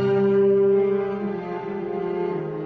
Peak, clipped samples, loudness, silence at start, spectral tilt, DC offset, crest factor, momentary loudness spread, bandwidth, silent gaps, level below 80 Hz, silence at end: -10 dBFS; under 0.1%; -22 LUFS; 0 s; -10 dB/octave; under 0.1%; 12 dB; 11 LU; 4.7 kHz; none; -60 dBFS; 0 s